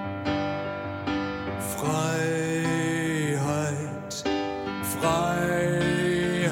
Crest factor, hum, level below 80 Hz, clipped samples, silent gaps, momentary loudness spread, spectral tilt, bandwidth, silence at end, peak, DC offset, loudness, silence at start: 16 dB; none; -52 dBFS; under 0.1%; none; 7 LU; -5 dB/octave; 17 kHz; 0 s; -10 dBFS; under 0.1%; -27 LUFS; 0 s